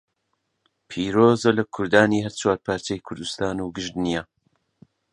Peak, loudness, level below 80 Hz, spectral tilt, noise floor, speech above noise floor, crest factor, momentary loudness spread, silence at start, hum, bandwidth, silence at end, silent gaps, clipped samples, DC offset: 0 dBFS; -22 LUFS; -54 dBFS; -5 dB/octave; -75 dBFS; 53 dB; 22 dB; 12 LU; 0.9 s; none; 11 kHz; 0.9 s; none; under 0.1%; under 0.1%